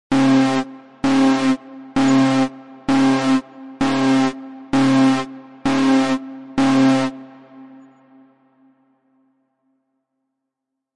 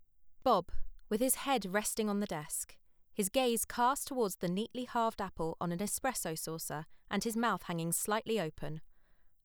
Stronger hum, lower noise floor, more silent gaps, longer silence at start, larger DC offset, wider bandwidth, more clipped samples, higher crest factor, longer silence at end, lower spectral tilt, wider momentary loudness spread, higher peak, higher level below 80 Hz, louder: neither; first, -81 dBFS vs -62 dBFS; neither; about the same, 0.1 s vs 0 s; neither; second, 11 kHz vs over 20 kHz; neither; about the same, 14 dB vs 18 dB; first, 3.3 s vs 0.15 s; first, -5.5 dB/octave vs -3.5 dB/octave; about the same, 11 LU vs 9 LU; first, -6 dBFS vs -16 dBFS; about the same, -56 dBFS vs -54 dBFS; first, -18 LUFS vs -35 LUFS